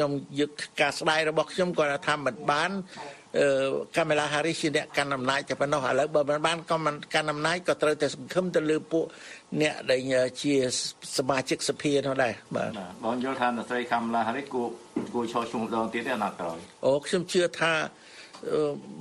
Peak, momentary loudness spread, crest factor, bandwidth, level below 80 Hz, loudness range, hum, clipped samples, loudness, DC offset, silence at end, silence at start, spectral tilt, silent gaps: -10 dBFS; 7 LU; 18 dB; 12.5 kHz; -66 dBFS; 3 LU; none; under 0.1%; -28 LUFS; under 0.1%; 0 s; 0 s; -4 dB/octave; none